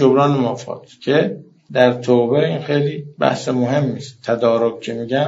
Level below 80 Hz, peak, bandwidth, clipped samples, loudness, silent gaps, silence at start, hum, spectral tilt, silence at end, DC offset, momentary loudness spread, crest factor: -64 dBFS; 0 dBFS; 7.8 kHz; under 0.1%; -18 LUFS; none; 0 s; none; -5.5 dB/octave; 0 s; under 0.1%; 12 LU; 18 dB